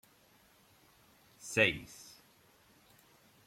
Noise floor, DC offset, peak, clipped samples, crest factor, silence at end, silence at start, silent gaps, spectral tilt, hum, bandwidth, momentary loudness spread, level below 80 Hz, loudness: -66 dBFS; under 0.1%; -14 dBFS; under 0.1%; 26 dB; 1.45 s; 1.4 s; none; -3.5 dB/octave; none; 16.5 kHz; 24 LU; -70 dBFS; -31 LUFS